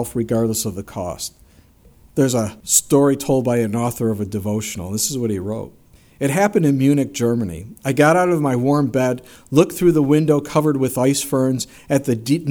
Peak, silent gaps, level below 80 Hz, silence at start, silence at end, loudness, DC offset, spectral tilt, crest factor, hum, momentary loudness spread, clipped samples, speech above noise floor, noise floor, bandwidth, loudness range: 0 dBFS; none; -50 dBFS; 0 s; 0 s; -18 LUFS; under 0.1%; -5.5 dB/octave; 18 dB; none; 12 LU; under 0.1%; 32 dB; -50 dBFS; over 20 kHz; 3 LU